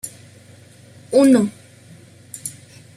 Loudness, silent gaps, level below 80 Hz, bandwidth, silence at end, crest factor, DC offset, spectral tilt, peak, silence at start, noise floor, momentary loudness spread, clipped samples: -16 LUFS; none; -64 dBFS; 14.5 kHz; 0.45 s; 18 dB; under 0.1%; -5.5 dB/octave; -4 dBFS; 0.05 s; -46 dBFS; 20 LU; under 0.1%